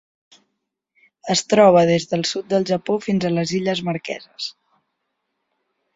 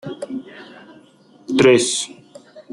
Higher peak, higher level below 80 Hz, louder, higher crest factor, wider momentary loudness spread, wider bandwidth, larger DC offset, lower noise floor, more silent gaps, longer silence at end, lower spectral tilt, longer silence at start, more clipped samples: about the same, -2 dBFS vs -2 dBFS; about the same, -60 dBFS vs -60 dBFS; about the same, -19 LUFS vs -17 LUFS; about the same, 20 dB vs 18 dB; second, 17 LU vs 23 LU; second, 8 kHz vs 12 kHz; neither; first, -77 dBFS vs -50 dBFS; neither; first, 1.45 s vs 0.1 s; first, -5 dB/octave vs -3.5 dB/octave; first, 1.25 s vs 0.05 s; neither